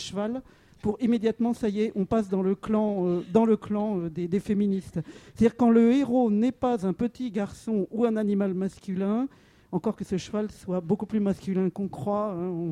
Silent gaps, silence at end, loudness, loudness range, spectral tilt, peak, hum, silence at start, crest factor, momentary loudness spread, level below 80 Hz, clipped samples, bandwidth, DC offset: none; 0 s; -27 LUFS; 5 LU; -8 dB/octave; -8 dBFS; none; 0 s; 18 dB; 9 LU; -56 dBFS; under 0.1%; 11 kHz; under 0.1%